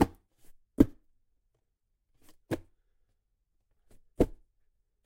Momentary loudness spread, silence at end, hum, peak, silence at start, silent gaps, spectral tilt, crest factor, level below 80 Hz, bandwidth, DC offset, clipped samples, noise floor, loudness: 12 LU; 0.75 s; none; -8 dBFS; 0 s; none; -7.5 dB/octave; 28 dB; -46 dBFS; 16.5 kHz; under 0.1%; under 0.1%; -79 dBFS; -31 LUFS